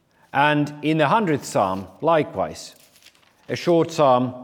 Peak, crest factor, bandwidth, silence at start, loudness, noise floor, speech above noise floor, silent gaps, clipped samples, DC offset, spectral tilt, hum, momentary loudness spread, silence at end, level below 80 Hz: -2 dBFS; 18 dB; 17.5 kHz; 0.35 s; -21 LUFS; -54 dBFS; 34 dB; none; under 0.1%; under 0.1%; -5.5 dB/octave; none; 11 LU; 0 s; -66 dBFS